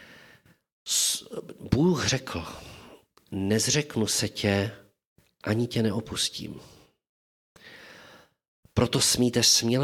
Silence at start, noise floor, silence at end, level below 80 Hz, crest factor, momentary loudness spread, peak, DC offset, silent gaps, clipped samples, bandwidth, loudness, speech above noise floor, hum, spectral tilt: 0 s; -57 dBFS; 0 s; -54 dBFS; 22 dB; 20 LU; -6 dBFS; under 0.1%; 0.72-0.86 s, 5.06-5.16 s, 7.09-7.55 s, 8.48-8.63 s; under 0.1%; 18 kHz; -25 LUFS; 32 dB; none; -3.5 dB/octave